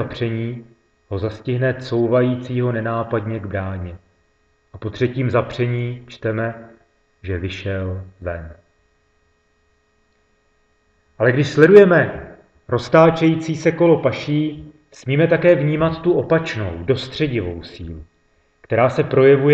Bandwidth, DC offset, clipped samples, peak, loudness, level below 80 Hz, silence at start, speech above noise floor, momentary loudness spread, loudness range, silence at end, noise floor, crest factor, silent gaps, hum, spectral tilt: 8 kHz; under 0.1%; under 0.1%; 0 dBFS; -18 LUFS; -48 dBFS; 0 s; 45 dB; 18 LU; 15 LU; 0 s; -62 dBFS; 18 dB; none; none; -7.5 dB/octave